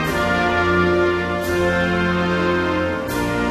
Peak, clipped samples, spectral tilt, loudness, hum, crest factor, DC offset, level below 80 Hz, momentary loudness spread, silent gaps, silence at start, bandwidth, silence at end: -6 dBFS; under 0.1%; -6 dB/octave; -19 LUFS; none; 14 dB; under 0.1%; -38 dBFS; 5 LU; none; 0 s; 15 kHz; 0 s